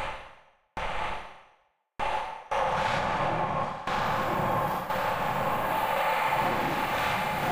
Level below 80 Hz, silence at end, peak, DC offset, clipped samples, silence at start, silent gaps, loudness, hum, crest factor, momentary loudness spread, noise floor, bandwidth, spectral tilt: -50 dBFS; 0 s; -14 dBFS; 0.5%; under 0.1%; 0 s; none; -29 LUFS; none; 14 dB; 9 LU; -67 dBFS; 16 kHz; -4.5 dB/octave